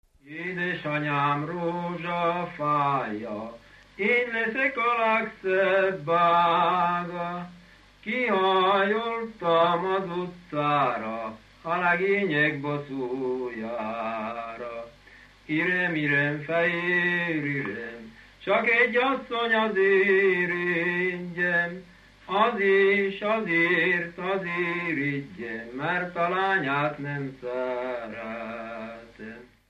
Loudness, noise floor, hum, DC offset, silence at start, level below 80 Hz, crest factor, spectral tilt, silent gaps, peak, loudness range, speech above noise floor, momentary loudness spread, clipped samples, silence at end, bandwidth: -25 LUFS; -53 dBFS; none; under 0.1%; 0.25 s; -64 dBFS; 18 dB; -7 dB/octave; none; -10 dBFS; 5 LU; 27 dB; 14 LU; under 0.1%; 0.25 s; 8.2 kHz